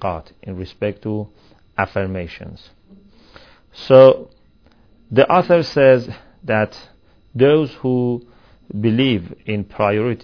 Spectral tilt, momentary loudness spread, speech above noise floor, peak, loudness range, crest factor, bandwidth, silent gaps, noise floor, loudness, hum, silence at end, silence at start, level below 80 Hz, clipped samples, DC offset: -8 dB/octave; 20 LU; 36 dB; 0 dBFS; 12 LU; 18 dB; 5.4 kHz; none; -53 dBFS; -16 LUFS; none; 0.05 s; 0 s; -50 dBFS; under 0.1%; 0.2%